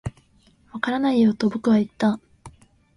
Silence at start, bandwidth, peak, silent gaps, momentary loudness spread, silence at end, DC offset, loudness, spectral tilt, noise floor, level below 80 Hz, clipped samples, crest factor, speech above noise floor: 0.05 s; 11 kHz; -6 dBFS; none; 15 LU; 0.45 s; under 0.1%; -22 LUFS; -7 dB/octave; -58 dBFS; -52 dBFS; under 0.1%; 18 dB; 38 dB